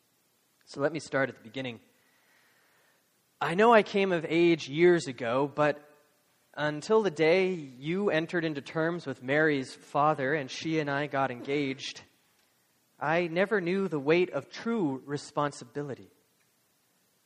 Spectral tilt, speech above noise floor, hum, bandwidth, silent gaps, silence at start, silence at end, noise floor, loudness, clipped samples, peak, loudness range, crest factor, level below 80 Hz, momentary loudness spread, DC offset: -6 dB/octave; 42 dB; none; 11 kHz; none; 0.7 s; 1.2 s; -70 dBFS; -29 LUFS; under 0.1%; -6 dBFS; 6 LU; 22 dB; -74 dBFS; 14 LU; under 0.1%